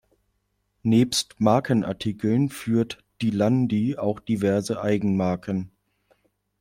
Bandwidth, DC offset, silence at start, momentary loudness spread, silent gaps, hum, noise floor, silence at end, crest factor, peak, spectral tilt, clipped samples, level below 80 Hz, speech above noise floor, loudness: 16 kHz; under 0.1%; 0.85 s; 8 LU; none; 50 Hz at -45 dBFS; -73 dBFS; 0.95 s; 20 dB; -4 dBFS; -6 dB/octave; under 0.1%; -58 dBFS; 50 dB; -24 LUFS